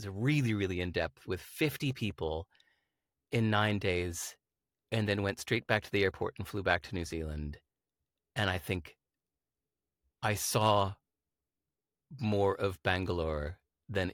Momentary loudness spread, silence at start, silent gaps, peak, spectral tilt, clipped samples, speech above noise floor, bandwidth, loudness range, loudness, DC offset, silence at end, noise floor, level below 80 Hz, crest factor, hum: 11 LU; 0 s; none; -12 dBFS; -5 dB/octave; under 0.1%; over 57 dB; 17.5 kHz; 4 LU; -33 LUFS; under 0.1%; 0 s; under -90 dBFS; -54 dBFS; 22 dB; none